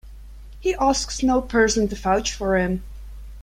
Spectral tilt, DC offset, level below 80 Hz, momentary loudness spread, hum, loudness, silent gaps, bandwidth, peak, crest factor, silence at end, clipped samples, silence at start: -4 dB/octave; under 0.1%; -36 dBFS; 15 LU; none; -21 LUFS; none; 16 kHz; -6 dBFS; 18 dB; 0 s; under 0.1%; 0.05 s